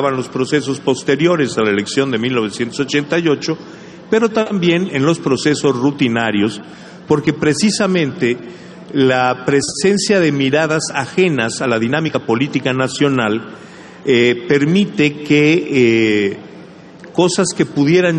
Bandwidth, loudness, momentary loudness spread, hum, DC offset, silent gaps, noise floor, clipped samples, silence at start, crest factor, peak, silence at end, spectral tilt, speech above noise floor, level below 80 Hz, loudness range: 10 kHz; -15 LUFS; 8 LU; none; under 0.1%; none; -37 dBFS; under 0.1%; 0 s; 14 dB; -2 dBFS; 0 s; -5 dB/octave; 22 dB; -54 dBFS; 2 LU